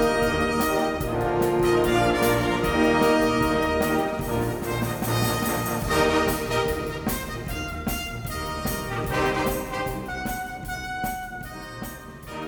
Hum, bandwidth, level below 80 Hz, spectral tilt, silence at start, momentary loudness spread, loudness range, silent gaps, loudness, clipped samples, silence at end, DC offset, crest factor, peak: none; over 20 kHz; -38 dBFS; -5 dB/octave; 0 s; 11 LU; 6 LU; none; -24 LUFS; under 0.1%; 0 s; under 0.1%; 16 dB; -8 dBFS